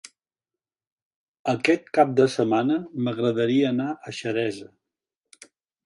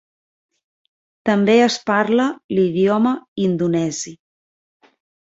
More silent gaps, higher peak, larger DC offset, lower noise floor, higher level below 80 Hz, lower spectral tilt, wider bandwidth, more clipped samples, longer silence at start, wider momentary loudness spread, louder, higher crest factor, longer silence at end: second, none vs 2.44-2.49 s, 3.28-3.36 s; about the same, -4 dBFS vs -2 dBFS; neither; about the same, under -90 dBFS vs under -90 dBFS; second, -70 dBFS vs -62 dBFS; about the same, -6 dB/octave vs -5.5 dB/octave; first, 11.5 kHz vs 8.2 kHz; neither; first, 1.45 s vs 1.25 s; about the same, 10 LU vs 9 LU; second, -23 LUFS vs -18 LUFS; about the same, 20 dB vs 18 dB; about the same, 1.2 s vs 1.25 s